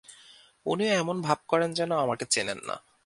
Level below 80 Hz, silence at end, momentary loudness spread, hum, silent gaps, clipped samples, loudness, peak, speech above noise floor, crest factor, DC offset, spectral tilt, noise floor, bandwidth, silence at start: -70 dBFS; 0.25 s; 9 LU; none; none; under 0.1%; -28 LUFS; -8 dBFS; 28 dB; 20 dB; under 0.1%; -3.5 dB/octave; -55 dBFS; 11.5 kHz; 0.1 s